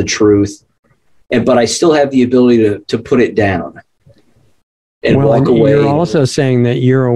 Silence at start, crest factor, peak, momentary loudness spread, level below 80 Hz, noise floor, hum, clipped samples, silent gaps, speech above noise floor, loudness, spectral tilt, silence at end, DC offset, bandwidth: 0 s; 12 dB; 0 dBFS; 8 LU; -44 dBFS; -53 dBFS; none; under 0.1%; 0.79-0.83 s, 4.63-5.01 s; 42 dB; -11 LUFS; -6 dB/octave; 0 s; under 0.1%; 12 kHz